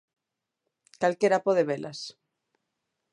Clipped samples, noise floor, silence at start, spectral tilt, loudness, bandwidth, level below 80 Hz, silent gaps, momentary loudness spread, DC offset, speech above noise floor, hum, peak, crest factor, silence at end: under 0.1%; -86 dBFS; 1 s; -5 dB/octave; -26 LUFS; 11 kHz; -80 dBFS; none; 16 LU; under 0.1%; 60 dB; none; -10 dBFS; 20 dB; 1 s